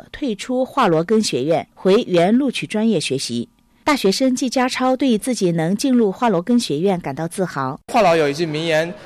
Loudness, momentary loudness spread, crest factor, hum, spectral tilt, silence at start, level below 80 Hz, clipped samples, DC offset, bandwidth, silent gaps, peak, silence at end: -18 LUFS; 8 LU; 10 dB; none; -5 dB/octave; 0.15 s; -54 dBFS; under 0.1%; under 0.1%; 14 kHz; none; -8 dBFS; 0 s